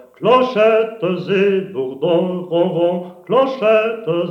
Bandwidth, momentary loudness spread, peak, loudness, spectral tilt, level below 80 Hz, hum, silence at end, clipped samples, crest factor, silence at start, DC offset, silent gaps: 6.8 kHz; 7 LU; -2 dBFS; -17 LUFS; -7.5 dB/octave; -70 dBFS; none; 0 s; under 0.1%; 14 dB; 0.2 s; under 0.1%; none